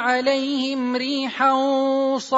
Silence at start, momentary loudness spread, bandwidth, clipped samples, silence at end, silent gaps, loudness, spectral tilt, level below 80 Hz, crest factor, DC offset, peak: 0 s; 4 LU; 7.8 kHz; under 0.1%; 0 s; none; -21 LUFS; -3 dB/octave; -72 dBFS; 14 dB; under 0.1%; -6 dBFS